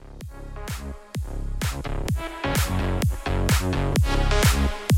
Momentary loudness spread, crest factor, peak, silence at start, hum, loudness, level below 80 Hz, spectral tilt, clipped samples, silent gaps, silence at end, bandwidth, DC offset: 14 LU; 16 dB; -6 dBFS; 0 s; none; -25 LUFS; -28 dBFS; -5 dB/octave; under 0.1%; none; 0 s; 16.5 kHz; under 0.1%